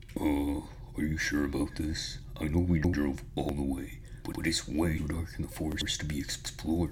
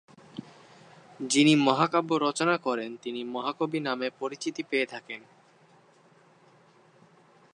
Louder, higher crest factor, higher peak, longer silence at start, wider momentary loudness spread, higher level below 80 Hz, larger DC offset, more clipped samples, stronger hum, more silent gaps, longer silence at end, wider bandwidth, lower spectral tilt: second, -33 LUFS vs -27 LUFS; second, 16 dB vs 22 dB; second, -16 dBFS vs -6 dBFS; second, 0 s vs 0.35 s; second, 10 LU vs 21 LU; first, -42 dBFS vs -82 dBFS; neither; neither; neither; neither; second, 0 s vs 2.35 s; first, 17 kHz vs 11 kHz; about the same, -5 dB/octave vs -4 dB/octave